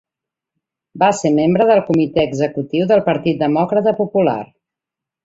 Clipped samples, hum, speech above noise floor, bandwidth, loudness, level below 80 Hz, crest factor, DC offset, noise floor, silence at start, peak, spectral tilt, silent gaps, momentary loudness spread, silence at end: under 0.1%; none; 70 dB; 8 kHz; -16 LUFS; -54 dBFS; 16 dB; under 0.1%; -85 dBFS; 0.95 s; -2 dBFS; -6.5 dB/octave; none; 6 LU; 0.8 s